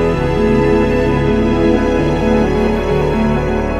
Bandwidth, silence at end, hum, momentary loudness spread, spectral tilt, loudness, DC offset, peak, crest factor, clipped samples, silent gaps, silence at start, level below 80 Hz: 12 kHz; 0 s; none; 2 LU; -7.5 dB/octave; -14 LUFS; under 0.1%; 0 dBFS; 12 dB; under 0.1%; none; 0 s; -22 dBFS